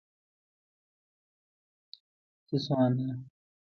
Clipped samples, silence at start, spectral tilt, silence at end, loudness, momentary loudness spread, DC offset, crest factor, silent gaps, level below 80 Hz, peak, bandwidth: under 0.1%; 2.5 s; -8.5 dB/octave; 0.4 s; -30 LUFS; 10 LU; under 0.1%; 20 dB; none; -74 dBFS; -14 dBFS; 6.6 kHz